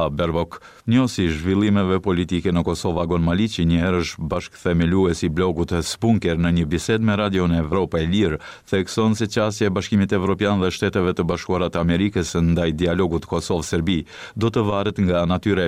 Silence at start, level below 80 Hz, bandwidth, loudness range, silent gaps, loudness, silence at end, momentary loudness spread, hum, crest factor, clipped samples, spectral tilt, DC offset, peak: 0 s; -38 dBFS; 14 kHz; 1 LU; none; -21 LUFS; 0 s; 4 LU; none; 12 dB; under 0.1%; -6.5 dB/octave; 0.2%; -8 dBFS